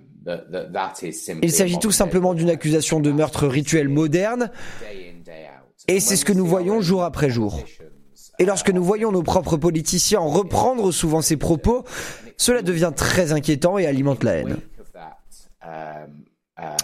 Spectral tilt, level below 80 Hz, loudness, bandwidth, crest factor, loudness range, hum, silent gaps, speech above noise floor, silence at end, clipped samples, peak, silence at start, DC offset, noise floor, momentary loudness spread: -4.5 dB/octave; -40 dBFS; -20 LUFS; 16 kHz; 20 dB; 3 LU; none; none; 25 dB; 0 s; under 0.1%; -2 dBFS; 0.25 s; under 0.1%; -45 dBFS; 14 LU